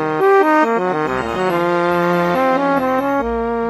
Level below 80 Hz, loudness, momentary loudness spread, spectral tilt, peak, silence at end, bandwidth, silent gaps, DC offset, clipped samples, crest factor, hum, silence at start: -42 dBFS; -16 LUFS; 6 LU; -6.5 dB/octave; -2 dBFS; 0 s; 13 kHz; none; under 0.1%; under 0.1%; 14 dB; none; 0 s